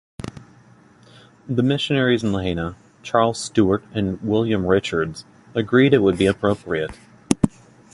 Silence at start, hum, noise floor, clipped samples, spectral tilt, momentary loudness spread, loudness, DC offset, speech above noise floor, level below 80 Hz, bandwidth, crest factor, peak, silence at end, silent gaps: 0.2 s; none; -50 dBFS; under 0.1%; -6 dB/octave; 13 LU; -20 LUFS; under 0.1%; 31 dB; -46 dBFS; 11.5 kHz; 20 dB; 0 dBFS; 0.45 s; none